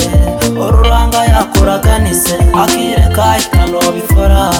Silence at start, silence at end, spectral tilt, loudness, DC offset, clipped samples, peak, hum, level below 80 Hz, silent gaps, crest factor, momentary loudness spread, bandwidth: 0 s; 0 s; -5 dB/octave; -10 LUFS; under 0.1%; under 0.1%; 0 dBFS; none; -12 dBFS; none; 8 dB; 2 LU; 18 kHz